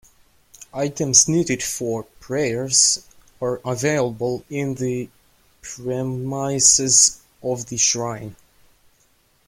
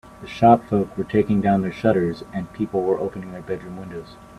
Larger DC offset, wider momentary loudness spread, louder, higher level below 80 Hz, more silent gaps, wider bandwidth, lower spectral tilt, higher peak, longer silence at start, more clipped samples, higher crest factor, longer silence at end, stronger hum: neither; about the same, 17 LU vs 18 LU; about the same, -19 LUFS vs -21 LUFS; about the same, -54 dBFS vs -50 dBFS; neither; first, 16.5 kHz vs 12 kHz; second, -2.5 dB/octave vs -8.5 dB/octave; about the same, 0 dBFS vs 0 dBFS; first, 0.6 s vs 0.05 s; neither; about the same, 22 dB vs 20 dB; first, 1.15 s vs 0.05 s; neither